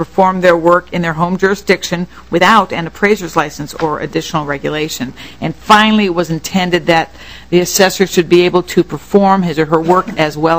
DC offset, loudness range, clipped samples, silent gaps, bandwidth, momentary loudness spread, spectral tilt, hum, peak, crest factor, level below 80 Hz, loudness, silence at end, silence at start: 1%; 3 LU; 0.9%; none; 16 kHz; 10 LU; -4.5 dB/octave; none; 0 dBFS; 12 dB; -42 dBFS; -13 LUFS; 0 s; 0 s